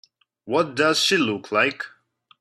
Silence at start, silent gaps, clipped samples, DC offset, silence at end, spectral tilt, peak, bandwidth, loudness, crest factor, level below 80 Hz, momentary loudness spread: 0.45 s; none; under 0.1%; under 0.1%; 0.55 s; -3 dB/octave; -4 dBFS; 14 kHz; -21 LUFS; 20 dB; -70 dBFS; 11 LU